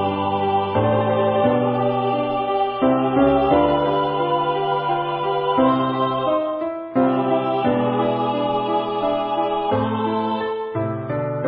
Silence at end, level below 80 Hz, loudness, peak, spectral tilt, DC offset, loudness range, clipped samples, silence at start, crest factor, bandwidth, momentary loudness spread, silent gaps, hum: 0 s; -48 dBFS; -20 LUFS; -4 dBFS; -11.5 dB/octave; under 0.1%; 2 LU; under 0.1%; 0 s; 14 dB; 5.2 kHz; 6 LU; none; none